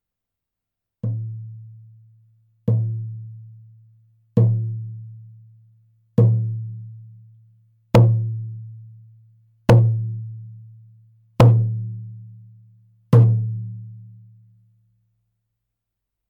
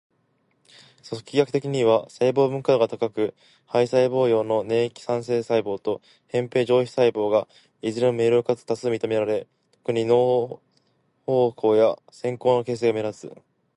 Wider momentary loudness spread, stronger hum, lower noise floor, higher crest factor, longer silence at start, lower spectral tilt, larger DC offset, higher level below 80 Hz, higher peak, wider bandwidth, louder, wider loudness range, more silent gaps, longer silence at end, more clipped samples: first, 25 LU vs 11 LU; neither; first, -84 dBFS vs -68 dBFS; about the same, 22 dB vs 18 dB; about the same, 1.05 s vs 1.05 s; first, -9 dB/octave vs -6.5 dB/octave; neither; first, -50 dBFS vs -68 dBFS; first, 0 dBFS vs -6 dBFS; second, 6.4 kHz vs 11 kHz; first, -20 LUFS vs -23 LUFS; first, 9 LU vs 2 LU; neither; first, 2.25 s vs 0.45 s; neither